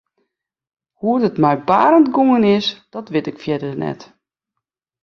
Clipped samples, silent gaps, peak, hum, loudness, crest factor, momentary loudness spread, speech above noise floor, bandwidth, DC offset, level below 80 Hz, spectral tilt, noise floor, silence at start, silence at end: under 0.1%; none; -2 dBFS; none; -16 LUFS; 16 dB; 13 LU; 65 dB; 6.8 kHz; under 0.1%; -60 dBFS; -7 dB/octave; -81 dBFS; 1.05 s; 1 s